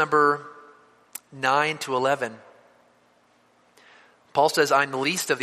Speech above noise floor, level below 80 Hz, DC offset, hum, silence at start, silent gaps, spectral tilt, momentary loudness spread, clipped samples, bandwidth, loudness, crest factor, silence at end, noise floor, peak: 39 dB; -74 dBFS; under 0.1%; 60 Hz at -65 dBFS; 0 s; none; -3 dB/octave; 20 LU; under 0.1%; 15 kHz; -23 LUFS; 20 dB; 0 s; -61 dBFS; -6 dBFS